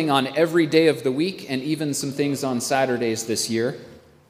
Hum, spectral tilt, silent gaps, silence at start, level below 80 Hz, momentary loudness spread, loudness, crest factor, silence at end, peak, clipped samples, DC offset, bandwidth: none; -4.5 dB/octave; none; 0 s; -66 dBFS; 8 LU; -22 LUFS; 18 dB; 0.3 s; -4 dBFS; under 0.1%; under 0.1%; 16 kHz